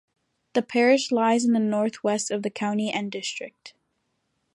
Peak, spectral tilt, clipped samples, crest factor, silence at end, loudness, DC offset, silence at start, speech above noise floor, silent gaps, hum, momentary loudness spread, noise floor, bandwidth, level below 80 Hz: -8 dBFS; -4 dB/octave; under 0.1%; 18 dB; 0.9 s; -24 LUFS; under 0.1%; 0.55 s; 51 dB; none; none; 11 LU; -75 dBFS; 11 kHz; -76 dBFS